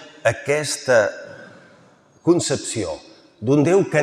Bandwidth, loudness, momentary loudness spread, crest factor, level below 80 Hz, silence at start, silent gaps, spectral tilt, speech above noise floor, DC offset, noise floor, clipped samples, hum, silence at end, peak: 15 kHz; -20 LUFS; 14 LU; 18 dB; -62 dBFS; 0 s; none; -5 dB/octave; 34 dB; under 0.1%; -52 dBFS; under 0.1%; none; 0 s; -2 dBFS